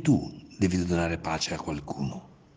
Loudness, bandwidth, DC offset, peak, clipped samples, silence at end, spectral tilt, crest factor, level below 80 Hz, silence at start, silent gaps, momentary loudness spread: -29 LUFS; 9.8 kHz; under 0.1%; -10 dBFS; under 0.1%; 0.25 s; -5.5 dB/octave; 18 dB; -52 dBFS; 0 s; none; 10 LU